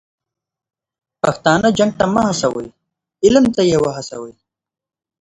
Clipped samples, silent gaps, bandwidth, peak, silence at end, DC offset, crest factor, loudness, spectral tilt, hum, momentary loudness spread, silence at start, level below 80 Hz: under 0.1%; none; 11 kHz; 0 dBFS; 0.9 s; under 0.1%; 18 dB; -15 LUFS; -5 dB/octave; none; 17 LU; 1.25 s; -48 dBFS